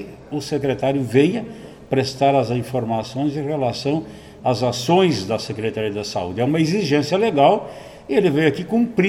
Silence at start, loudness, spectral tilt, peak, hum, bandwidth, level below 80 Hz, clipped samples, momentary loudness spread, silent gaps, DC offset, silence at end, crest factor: 0 s; -20 LUFS; -6 dB/octave; -2 dBFS; none; 16 kHz; -52 dBFS; under 0.1%; 9 LU; none; under 0.1%; 0 s; 18 dB